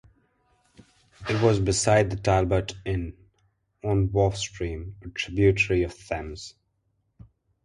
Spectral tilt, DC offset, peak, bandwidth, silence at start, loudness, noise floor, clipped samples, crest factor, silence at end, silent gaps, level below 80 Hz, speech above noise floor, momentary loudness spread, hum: -5.5 dB/octave; under 0.1%; -6 dBFS; 11.5 kHz; 1.2 s; -25 LUFS; -73 dBFS; under 0.1%; 20 dB; 1.15 s; none; -42 dBFS; 49 dB; 16 LU; none